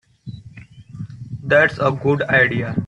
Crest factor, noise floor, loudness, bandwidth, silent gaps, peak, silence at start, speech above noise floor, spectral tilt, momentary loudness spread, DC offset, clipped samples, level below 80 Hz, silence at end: 18 dB; -41 dBFS; -16 LUFS; 10 kHz; none; -2 dBFS; 0.25 s; 24 dB; -7.5 dB/octave; 22 LU; under 0.1%; under 0.1%; -52 dBFS; 0 s